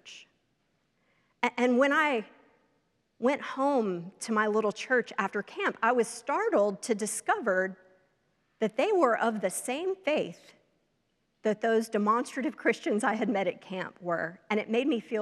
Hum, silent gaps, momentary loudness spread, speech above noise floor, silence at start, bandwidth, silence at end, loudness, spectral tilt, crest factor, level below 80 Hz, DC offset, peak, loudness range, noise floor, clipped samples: none; none; 8 LU; 47 dB; 0.05 s; 14 kHz; 0 s; -29 LUFS; -4 dB/octave; 20 dB; -84 dBFS; under 0.1%; -10 dBFS; 2 LU; -75 dBFS; under 0.1%